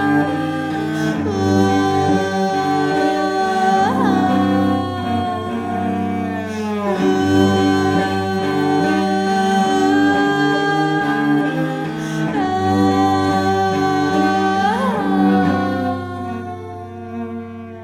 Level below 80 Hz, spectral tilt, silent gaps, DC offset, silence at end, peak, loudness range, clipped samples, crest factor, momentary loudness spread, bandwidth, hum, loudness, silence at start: -56 dBFS; -6 dB/octave; none; under 0.1%; 0 s; -2 dBFS; 3 LU; under 0.1%; 14 dB; 8 LU; 14.5 kHz; none; -17 LUFS; 0 s